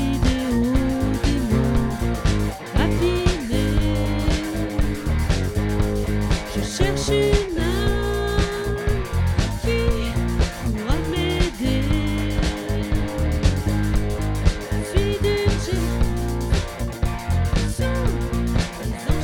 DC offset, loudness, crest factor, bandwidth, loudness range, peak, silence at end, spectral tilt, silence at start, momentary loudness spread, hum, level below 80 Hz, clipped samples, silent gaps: under 0.1%; -22 LUFS; 18 dB; 17.5 kHz; 1 LU; -2 dBFS; 0 s; -6 dB/octave; 0 s; 4 LU; none; -24 dBFS; under 0.1%; none